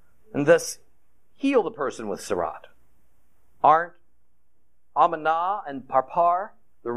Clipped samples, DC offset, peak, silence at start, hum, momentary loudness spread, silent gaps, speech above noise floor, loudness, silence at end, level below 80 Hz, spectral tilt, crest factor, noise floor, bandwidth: under 0.1%; 0.4%; -4 dBFS; 0.35 s; none; 14 LU; none; 49 dB; -24 LUFS; 0 s; -66 dBFS; -4.5 dB/octave; 20 dB; -71 dBFS; 14.5 kHz